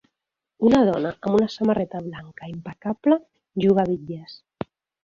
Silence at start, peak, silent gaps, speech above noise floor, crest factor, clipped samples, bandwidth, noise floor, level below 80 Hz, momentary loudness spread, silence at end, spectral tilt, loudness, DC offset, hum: 0.6 s; -4 dBFS; none; 62 dB; 18 dB; under 0.1%; 7.4 kHz; -84 dBFS; -56 dBFS; 18 LU; 0.7 s; -8 dB/octave; -22 LUFS; under 0.1%; none